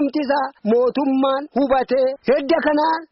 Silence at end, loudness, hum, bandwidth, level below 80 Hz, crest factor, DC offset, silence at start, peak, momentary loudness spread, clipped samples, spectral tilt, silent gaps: 0.05 s; -19 LUFS; none; 5.8 kHz; -54 dBFS; 10 dB; under 0.1%; 0 s; -8 dBFS; 3 LU; under 0.1%; -3.5 dB/octave; none